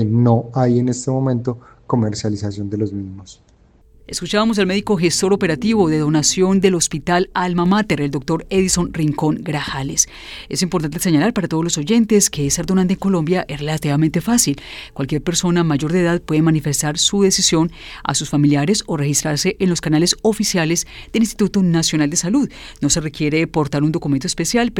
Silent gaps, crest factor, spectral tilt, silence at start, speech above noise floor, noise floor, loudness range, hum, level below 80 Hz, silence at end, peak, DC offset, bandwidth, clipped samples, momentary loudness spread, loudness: none; 16 dB; -4.5 dB/octave; 0 s; 33 dB; -50 dBFS; 4 LU; none; -42 dBFS; 0 s; 0 dBFS; under 0.1%; 17.5 kHz; under 0.1%; 8 LU; -17 LUFS